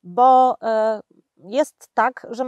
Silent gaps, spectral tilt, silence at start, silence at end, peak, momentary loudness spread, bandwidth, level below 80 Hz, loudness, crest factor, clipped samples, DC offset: none; -4.5 dB/octave; 0.05 s; 0 s; -4 dBFS; 11 LU; 12.5 kHz; -80 dBFS; -19 LUFS; 16 dB; under 0.1%; under 0.1%